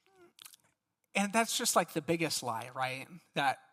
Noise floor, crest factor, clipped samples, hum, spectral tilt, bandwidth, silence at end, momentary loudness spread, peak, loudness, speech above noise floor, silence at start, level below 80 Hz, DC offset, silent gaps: -77 dBFS; 22 dB; under 0.1%; none; -3 dB/octave; 16 kHz; 0.15 s; 10 LU; -14 dBFS; -33 LUFS; 43 dB; 0.45 s; -80 dBFS; under 0.1%; none